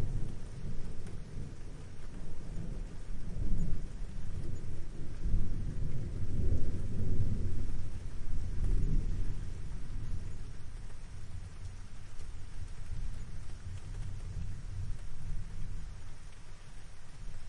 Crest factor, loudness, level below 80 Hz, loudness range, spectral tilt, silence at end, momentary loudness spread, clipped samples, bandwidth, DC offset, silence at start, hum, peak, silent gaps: 16 dB; -42 LUFS; -38 dBFS; 9 LU; -7 dB/octave; 0 s; 13 LU; under 0.1%; 9 kHz; under 0.1%; 0 s; none; -14 dBFS; none